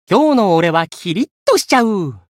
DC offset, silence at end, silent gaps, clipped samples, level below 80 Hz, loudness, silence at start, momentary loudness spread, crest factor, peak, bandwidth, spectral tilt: under 0.1%; 0.2 s; 1.31-1.46 s; under 0.1%; -62 dBFS; -15 LUFS; 0.1 s; 8 LU; 14 dB; 0 dBFS; 16.5 kHz; -5 dB/octave